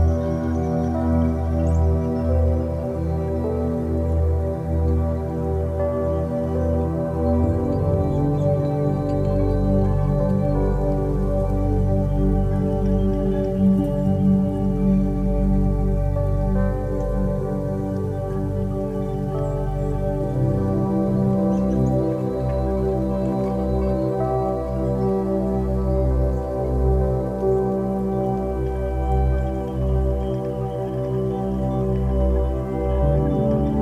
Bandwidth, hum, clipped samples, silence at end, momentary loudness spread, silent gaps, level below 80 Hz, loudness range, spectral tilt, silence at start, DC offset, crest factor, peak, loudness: 9.8 kHz; none; under 0.1%; 0 s; 5 LU; none; -28 dBFS; 3 LU; -10 dB/octave; 0 s; under 0.1%; 14 dB; -6 dBFS; -22 LUFS